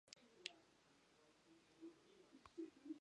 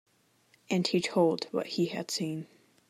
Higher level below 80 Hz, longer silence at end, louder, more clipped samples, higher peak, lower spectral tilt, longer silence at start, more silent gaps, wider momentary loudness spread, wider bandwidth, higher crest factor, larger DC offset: second, under -90 dBFS vs -78 dBFS; second, 0 s vs 0.45 s; second, -59 LUFS vs -30 LUFS; neither; second, -26 dBFS vs -14 dBFS; second, -2.5 dB/octave vs -5 dB/octave; second, 0.05 s vs 0.7 s; neither; about the same, 11 LU vs 9 LU; second, 10.5 kHz vs 15.5 kHz; first, 34 dB vs 18 dB; neither